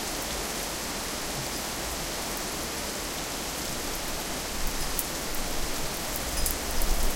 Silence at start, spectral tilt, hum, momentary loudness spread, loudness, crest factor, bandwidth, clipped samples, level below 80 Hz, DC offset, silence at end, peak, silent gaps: 0 s; -2 dB/octave; none; 3 LU; -31 LUFS; 26 dB; 17 kHz; under 0.1%; -36 dBFS; under 0.1%; 0 s; -4 dBFS; none